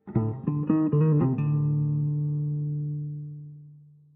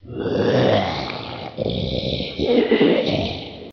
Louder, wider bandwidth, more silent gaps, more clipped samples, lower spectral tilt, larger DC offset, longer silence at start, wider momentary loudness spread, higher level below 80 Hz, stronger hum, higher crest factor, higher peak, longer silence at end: second, -26 LUFS vs -20 LUFS; second, 2.8 kHz vs 6.8 kHz; neither; neither; first, -13 dB/octave vs -7 dB/octave; neither; about the same, 0.05 s vs 0.05 s; first, 15 LU vs 11 LU; second, -60 dBFS vs -42 dBFS; neither; about the same, 14 dB vs 16 dB; second, -12 dBFS vs -4 dBFS; first, 0.35 s vs 0 s